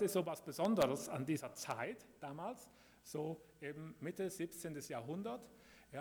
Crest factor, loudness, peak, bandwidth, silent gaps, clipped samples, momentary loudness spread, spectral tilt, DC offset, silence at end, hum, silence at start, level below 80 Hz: 20 dB; -43 LUFS; -22 dBFS; over 20 kHz; none; under 0.1%; 15 LU; -5 dB/octave; under 0.1%; 0 s; none; 0 s; -76 dBFS